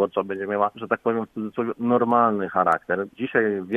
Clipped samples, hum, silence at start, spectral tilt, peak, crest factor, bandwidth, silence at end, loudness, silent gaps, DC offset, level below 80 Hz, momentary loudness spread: under 0.1%; none; 0 s; -8 dB/octave; -6 dBFS; 18 dB; 7.6 kHz; 0 s; -23 LUFS; none; under 0.1%; -66 dBFS; 8 LU